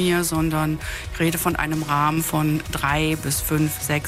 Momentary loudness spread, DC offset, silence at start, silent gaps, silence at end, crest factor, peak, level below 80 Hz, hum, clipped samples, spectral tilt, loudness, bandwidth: 3 LU; under 0.1%; 0 s; none; 0 s; 16 dB; -6 dBFS; -36 dBFS; none; under 0.1%; -4.5 dB/octave; -22 LUFS; 16 kHz